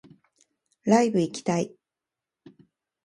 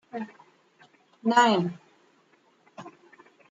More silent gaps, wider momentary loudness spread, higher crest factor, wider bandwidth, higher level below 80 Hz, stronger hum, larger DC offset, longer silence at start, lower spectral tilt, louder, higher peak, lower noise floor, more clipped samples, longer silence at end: neither; second, 12 LU vs 27 LU; about the same, 22 dB vs 22 dB; first, 11.5 kHz vs 9.2 kHz; first, -72 dBFS vs -78 dBFS; neither; neither; first, 0.85 s vs 0.15 s; about the same, -6 dB/octave vs -5 dB/octave; about the same, -25 LUFS vs -24 LUFS; about the same, -6 dBFS vs -8 dBFS; first, -88 dBFS vs -64 dBFS; neither; first, 1.4 s vs 0.6 s